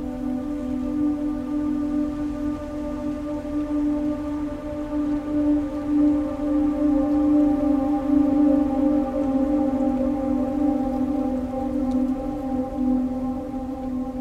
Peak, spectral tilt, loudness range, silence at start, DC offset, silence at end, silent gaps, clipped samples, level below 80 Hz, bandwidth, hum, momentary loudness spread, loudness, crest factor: -8 dBFS; -8.5 dB/octave; 6 LU; 0 s; under 0.1%; 0 s; none; under 0.1%; -40 dBFS; 7.4 kHz; none; 9 LU; -24 LUFS; 14 dB